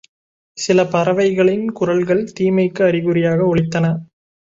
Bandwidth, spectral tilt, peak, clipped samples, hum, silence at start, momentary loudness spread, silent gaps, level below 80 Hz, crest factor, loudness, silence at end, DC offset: 7.8 kHz; -6.5 dB/octave; -2 dBFS; under 0.1%; none; 0.55 s; 5 LU; none; -50 dBFS; 14 dB; -17 LUFS; 0.5 s; under 0.1%